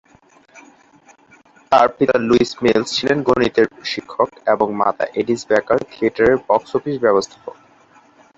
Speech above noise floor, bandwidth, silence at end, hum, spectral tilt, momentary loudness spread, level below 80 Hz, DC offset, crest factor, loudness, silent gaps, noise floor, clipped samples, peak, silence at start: 35 dB; 8 kHz; 0.9 s; none; -5 dB/octave; 7 LU; -50 dBFS; under 0.1%; 18 dB; -17 LUFS; none; -51 dBFS; under 0.1%; -2 dBFS; 0.55 s